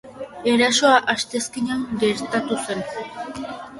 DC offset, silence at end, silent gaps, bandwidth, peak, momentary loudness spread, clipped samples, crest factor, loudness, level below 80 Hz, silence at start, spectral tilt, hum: under 0.1%; 0 s; none; 11.5 kHz; -2 dBFS; 16 LU; under 0.1%; 20 dB; -21 LUFS; -58 dBFS; 0.05 s; -3 dB/octave; none